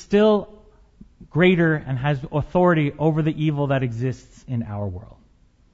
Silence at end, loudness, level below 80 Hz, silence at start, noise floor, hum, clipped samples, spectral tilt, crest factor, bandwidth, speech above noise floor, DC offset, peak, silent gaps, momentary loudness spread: 0.6 s; -21 LUFS; -46 dBFS; 0 s; -56 dBFS; none; under 0.1%; -8 dB/octave; 18 dB; 7.8 kHz; 35 dB; under 0.1%; -4 dBFS; none; 13 LU